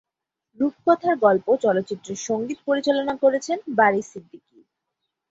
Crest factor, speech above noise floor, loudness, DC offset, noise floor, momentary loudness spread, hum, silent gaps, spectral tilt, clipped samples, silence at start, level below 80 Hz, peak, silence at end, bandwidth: 20 dB; 61 dB; -22 LUFS; under 0.1%; -83 dBFS; 10 LU; none; none; -4.5 dB/octave; under 0.1%; 0.6 s; -68 dBFS; -4 dBFS; 1.1 s; 8 kHz